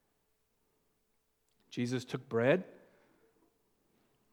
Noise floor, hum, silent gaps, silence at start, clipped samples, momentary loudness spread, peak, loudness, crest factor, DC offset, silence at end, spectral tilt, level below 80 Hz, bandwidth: -78 dBFS; none; none; 1.7 s; under 0.1%; 14 LU; -14 dBFS; -34 LUFS; 26 dB; under 0.1%; 1.6 s; -6.5 dB/octave; -86 dBFS; 20 kHz